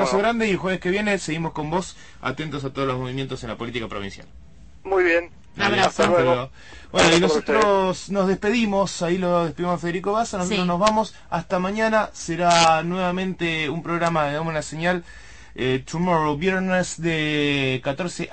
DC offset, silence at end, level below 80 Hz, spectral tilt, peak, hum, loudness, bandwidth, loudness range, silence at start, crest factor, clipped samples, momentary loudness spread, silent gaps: 0.5%; 0 s; -48 dBFS; -4.5 dB/octave; -4 dBFS; none; -22 LUFS; 8.8 kHz; 6 LU; 0 s; 18 dB; under 0.1%; 11 LU; none